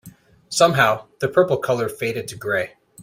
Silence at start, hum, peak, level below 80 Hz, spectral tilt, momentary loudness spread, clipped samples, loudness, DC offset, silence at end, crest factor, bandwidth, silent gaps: 0.05 s; none; -2 dBFS; -58 dBFS; -4 dB/octave; 11 LU; under 0.1%; -20 LUFS; under 0.1%; 0 s; 20 dB; 16 kHz; none